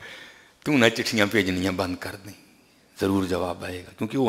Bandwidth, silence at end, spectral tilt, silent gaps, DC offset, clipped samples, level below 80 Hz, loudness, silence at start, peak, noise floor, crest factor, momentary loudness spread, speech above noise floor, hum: 16 kHz; 0 s; -5 dB/octave; none; under 0.1%; under 0.1%; -58 dBFS; -24 LUFS; 0 s; -2 dBFS; -57 dBFS; 24 dB; 20 LU; 33 dB; none